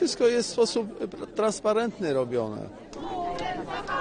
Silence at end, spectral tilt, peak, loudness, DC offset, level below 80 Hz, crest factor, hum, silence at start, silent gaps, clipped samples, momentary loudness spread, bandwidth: 0 s; -4 dB/octave; -12 dBFS; -28 LUFS; under 0.1%; -54 dBFS; 16 dB; none; 0 s; none; under 0.1%; 12 LU; 10 kHz